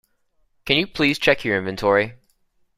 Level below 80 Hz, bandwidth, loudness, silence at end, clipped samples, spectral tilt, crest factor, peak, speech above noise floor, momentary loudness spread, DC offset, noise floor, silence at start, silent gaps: -50 dBFS; 15.5 kHz; -20 LUFS; 0.6 s; under 0.1%; -5 dB/octave; 20 dB; -2 dBFS; 45 dB; 7 LU; under 0.1%; -65 dBFS; 0.65 s; none